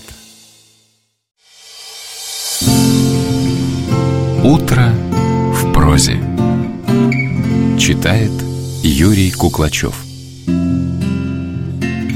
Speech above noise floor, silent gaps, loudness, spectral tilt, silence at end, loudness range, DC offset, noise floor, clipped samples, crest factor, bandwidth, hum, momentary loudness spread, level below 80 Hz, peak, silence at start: 47 dB; none; -14 LUFS; -5.5 dB/octave; 0 s; 3 LU; under 0.1%; -59 dBFS; under 0.1%; 14 dB; 16.5 kHz; none; 11 LU; -28 dBFS; 0 dBFS; 0 s